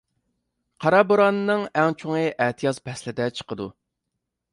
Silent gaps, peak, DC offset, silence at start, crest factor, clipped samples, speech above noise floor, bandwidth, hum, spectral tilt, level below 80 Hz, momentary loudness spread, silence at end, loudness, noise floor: none; -4 dBFS; under 0.1%; 0.8 s; 20 dB; under 0.1%; 59 dB; 11.5 kHz; none; -6 dB/octave; -64 dBFS; 14 LU; 0.8 s; -22 LUFS; -81 dBFS